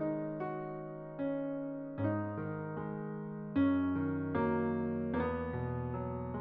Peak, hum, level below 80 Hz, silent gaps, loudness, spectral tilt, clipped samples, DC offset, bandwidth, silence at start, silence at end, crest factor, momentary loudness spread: -22 dBFS; none; -58 dBFS; none; -37 LUFS; -8.5 dB/octave; under 0.1%; under 0.1%; 4.2 kHz; 0 s; 0 s; 14 dB; 9 LU